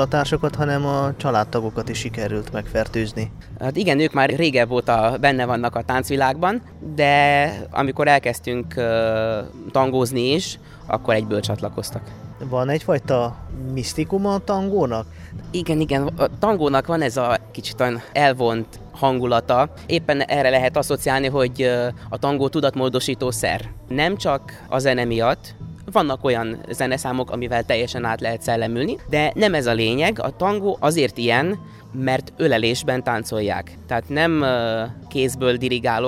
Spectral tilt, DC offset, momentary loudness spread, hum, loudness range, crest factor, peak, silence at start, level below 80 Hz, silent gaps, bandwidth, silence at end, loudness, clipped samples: -5.5 dB/octave; under 0.1%; 9 LU; none; 4 LU; 18 dB; -2 dBFS; 0 s; -44 dBFS; none; 16 kHz; 0 s; -21 LUFS; under 0.1%